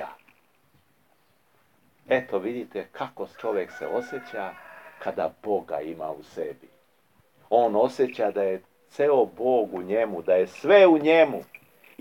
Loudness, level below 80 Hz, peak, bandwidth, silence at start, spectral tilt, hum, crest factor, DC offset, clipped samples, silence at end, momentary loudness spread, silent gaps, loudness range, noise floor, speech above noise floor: -24 LUFS; -78 dBFS; -6 dBFS; 16.5 kHz; 0 s; -6 dB/octave; none; 20 dB; under 0.1%; under 0.1%; 0.6 s; 17 LU; none; 11 LU; -66 dBFS; 42 dB